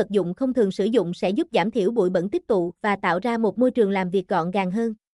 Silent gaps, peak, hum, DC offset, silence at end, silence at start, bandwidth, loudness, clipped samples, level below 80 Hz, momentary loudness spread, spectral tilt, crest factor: none; -8 dBFS; none; under 0.1%; 0.2 s; 0 s; 11.5 kHz; -23 LUFS; under 0.1%; -60 dBFS; 3 LU; -7 dB/octave; 14 dB